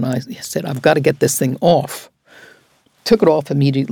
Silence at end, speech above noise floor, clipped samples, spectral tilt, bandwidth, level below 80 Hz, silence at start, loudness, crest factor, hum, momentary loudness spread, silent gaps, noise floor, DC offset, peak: 0 s; 40 dB; under 0.1%; -5.5 dB/octave; 19.5 kHz; -52 dBFS; 0 s; -16 LUFS; 16 dB; none; 12 LU; none; -56 dBFS; under 0.1%; 0 dBFS